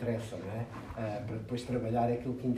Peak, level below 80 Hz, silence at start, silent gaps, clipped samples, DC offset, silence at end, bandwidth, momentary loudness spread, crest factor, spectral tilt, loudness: -18 dBFS; -56 dBFS; 0 s; none; under 0.1%; under 0.1%; 0 s; 13 kHz; 9 LU; 18 dB; -7.5 dB/octave; -36 LUFS